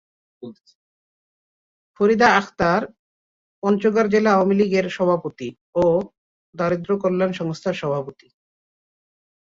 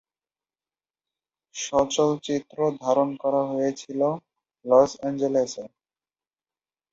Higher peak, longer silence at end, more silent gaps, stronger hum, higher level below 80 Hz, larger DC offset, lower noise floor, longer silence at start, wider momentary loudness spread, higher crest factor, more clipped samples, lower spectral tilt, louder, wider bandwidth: about the same, -2 dBFS vs -4 dBFS; first, 1.45 s vs 1.25 s; first, 0.60-0.64 s, 0.75-1.94 s, 2.99-3.62 s, 5.61-5.73 s, 6.18-6.53 s vs none; neither; first, -56 dBFS vs -64 dBFS; neither; about the same, under -90 dBFS vs under -90 dBFS; second, 0.4 s vs 1.55 s; first, 19 LU vs 15 LU; about the same, 20 dB vs 22 dB; neither; first, -6.5 dB/octave vs -5 dB/octave; first, -20 LUFS vs -24 LUFS; about the same, 7.6 kHz vs 7.8 kHz